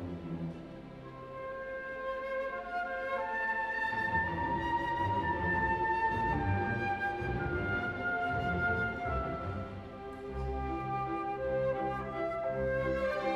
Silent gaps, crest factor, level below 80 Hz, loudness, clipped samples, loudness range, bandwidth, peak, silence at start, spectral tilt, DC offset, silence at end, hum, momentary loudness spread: none; 16 dB; -48 dBFS; -34 LUFS; under 0.1%; 5 LU; 12 kHz; -20 dBFS; 0 s; -7.5 dB/octave; under 0.1%; 0 s; none; 11 LU